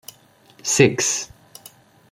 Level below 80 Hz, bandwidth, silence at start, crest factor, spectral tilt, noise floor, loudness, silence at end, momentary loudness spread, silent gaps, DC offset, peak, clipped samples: -58 dBFS; 16.5 kHz; 0.65 s; 22 dB; -3.5 dB/octave; -52 dBFS; -19 LUFS; 0.85 s; 14 LU; none; under 0.1%; -2 dBFS; under 0.1%